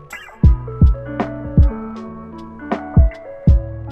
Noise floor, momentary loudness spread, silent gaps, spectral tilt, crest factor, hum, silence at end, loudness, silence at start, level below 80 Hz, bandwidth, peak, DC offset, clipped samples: -33 dBFS; 17 LU; none; -9.5 dB/octave; 14 dB; none; 0 s; -17 LUFS; 0.1 s; -18 dBFS; 8 kHz; -2 dBFS; under 0.1%; under 0.1%